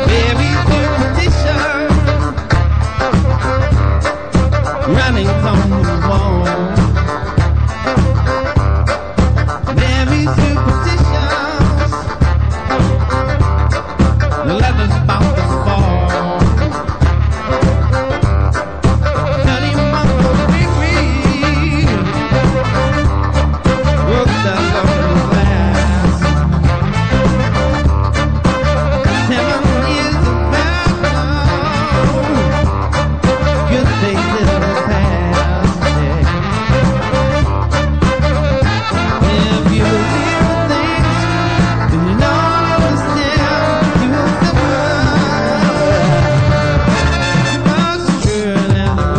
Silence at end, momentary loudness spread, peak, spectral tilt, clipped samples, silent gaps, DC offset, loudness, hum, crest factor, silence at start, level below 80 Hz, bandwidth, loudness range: 0 s; 3 LU; -2 dBFS; -6.5 dB/octave; under 0.1%; none; 1%; -13 LUFS; none; 10 dB; 0 s; -18 dBFS; 9.2 kHz; 1 LU